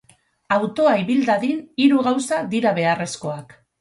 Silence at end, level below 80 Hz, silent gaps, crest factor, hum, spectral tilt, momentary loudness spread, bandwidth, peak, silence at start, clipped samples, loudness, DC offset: 0.35 s; -64 dBFS; none; 16 dB; none; -5 dB/octave; 10 LU; 11.5 kHz; -4 dBFS; 0.5 s; under 0.1%; -20 LUFS; under 0.1%